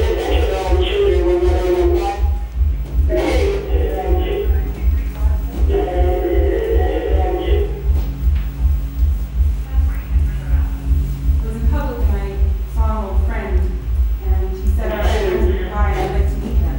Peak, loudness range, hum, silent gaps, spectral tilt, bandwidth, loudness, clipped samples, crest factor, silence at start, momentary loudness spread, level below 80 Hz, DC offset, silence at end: -4 dBFS; 3 LU; none; none; -7.5 dB/octave; 16.5 kHz; -19 LUFS; under 0.1%; 12 dB; 0 s; 4 LU; -18 dBFS; under 0.1%; 0 s